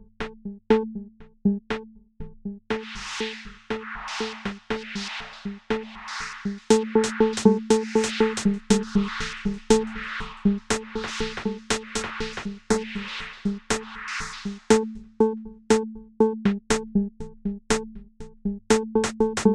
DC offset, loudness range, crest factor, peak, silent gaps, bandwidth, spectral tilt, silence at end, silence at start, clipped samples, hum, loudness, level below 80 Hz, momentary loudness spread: under 0.1%; 9 LU; 22 dB; -4 dBFS; none; 12 kHz; -4.5 dB/octave; 0 s; 0.2 s; under 0.1%; none; -26 LUFS; -44 dBFS; 13 LU